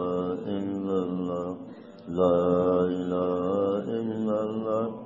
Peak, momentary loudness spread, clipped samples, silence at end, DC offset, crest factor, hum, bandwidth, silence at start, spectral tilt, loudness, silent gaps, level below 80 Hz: -10 dBFS; 11 LU; under 0.1%; 0 s; under 0.1%; 18 dB; none; 7.4 kHz; 0 s; -9 dB/octave; -27 LUFS; none; -66 dBFS